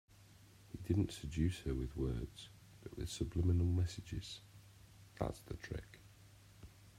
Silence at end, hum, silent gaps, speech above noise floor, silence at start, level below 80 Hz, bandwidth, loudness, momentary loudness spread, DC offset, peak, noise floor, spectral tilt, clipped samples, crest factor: 0.1 s; none; none; 24 dB; 0.2 s; -52 dBFS; 14.5 kHz; -41 LUFS; 24 LU; under 0.1%; -22 dBFS; -63 dBFS; -6.5 dB/octave; under 0.1%; 20 dB